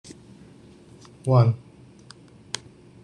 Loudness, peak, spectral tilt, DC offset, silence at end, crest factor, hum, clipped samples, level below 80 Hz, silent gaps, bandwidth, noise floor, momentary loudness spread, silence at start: -24 LUFS; -6 dBFS; -7 dB/octave; under 0.1%; 1.45 s; 20 dB; none; under 0.1%; -60 dBFS; none; 10.5 kHz; -49 dBFS; 24 LU; 0.1 s